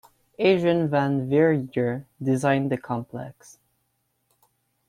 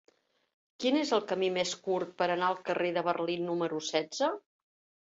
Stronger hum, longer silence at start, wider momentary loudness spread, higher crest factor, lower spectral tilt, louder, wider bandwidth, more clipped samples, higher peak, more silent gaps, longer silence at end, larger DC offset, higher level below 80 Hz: neither; second, 0.4 s vs 0.8 s; first, 11 LU vs 4 LU; about the same, 18 dB vs 18 dB; first, -7 dB/octave vs -4 dB/octave; first, -23 LUFS vs -31 LUFS; first, 14 kHz vs 8 kHz; neither; first, -6 dBFS vs -14 dBFS; neither; first, 1.6 s vs 0.65 s; neither; first, -64 dBFS vs -78 dBFS